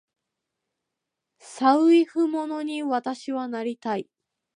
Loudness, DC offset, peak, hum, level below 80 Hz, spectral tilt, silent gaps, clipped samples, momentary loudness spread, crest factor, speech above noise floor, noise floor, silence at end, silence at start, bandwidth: -24 LUFS; under 0.1%; -6 dBFS; none; -84 dBFS; -5 dB/octave; none; under 0.1%; 12 LU; 20 dB; 61 dB; -84 dBFS; 0.55 s; 1.45 s; 10.5 kHz